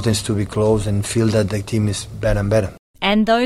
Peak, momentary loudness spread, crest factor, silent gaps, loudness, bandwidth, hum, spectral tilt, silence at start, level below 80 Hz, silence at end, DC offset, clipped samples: -4 dBFS; 5 LU; 14 dB; 2.79-2.94 s; -19 LUFS; 13.5 kHz; none; -5.5 dB/octave; 0 s; -34 dBFS; 0 s; under 0.1%; under 0.1%